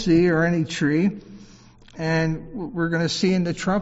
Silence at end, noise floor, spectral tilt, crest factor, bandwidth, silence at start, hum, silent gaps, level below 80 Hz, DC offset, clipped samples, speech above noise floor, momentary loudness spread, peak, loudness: 0 s; -48 dBFS; -5.5 dB/octave; 14 dB; 8 kHz; 0 s; none; none; -46 dBFS; under 0.1%; under 0.1%; 27 dB; 12 LU; -8 dBFS; -22 LUFS